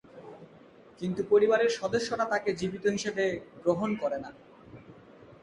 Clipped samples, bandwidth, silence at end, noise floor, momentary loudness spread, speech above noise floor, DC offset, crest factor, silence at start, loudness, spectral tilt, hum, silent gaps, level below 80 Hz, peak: under 0.1%; 11 kHz; 0.1 s; -54 dBFS; 15 LU; 26 dB; under 0.1%; 18 dB; 0.15 s; -29 LUFS; -5 dB/octave; none; none; -64 dBFS; -12 dBFS